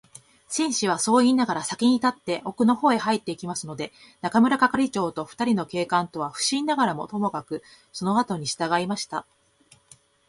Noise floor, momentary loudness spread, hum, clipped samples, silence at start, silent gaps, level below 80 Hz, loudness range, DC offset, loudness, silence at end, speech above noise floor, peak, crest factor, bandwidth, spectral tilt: -59 dBFS; 13 LU; none; under 0.1%; 0.5 s; none; -64 dBFS; 4 LU; under 0.1%; -24 LUFS; 1.1 s; 35 dB; -6 dBFS; 20 dB; 11.5 kHz; -4 dB/octave